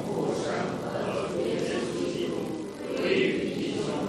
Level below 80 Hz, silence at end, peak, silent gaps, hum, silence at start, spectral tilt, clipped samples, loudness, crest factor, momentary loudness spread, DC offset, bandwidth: -58 dBFS; 0 s; -12 dBFS; none; none; 0 s; -5.5 dB/octave; under 0.1%; -29 LUFS; 16 dB; 7 LU; under 0.1%; 13.5 kHz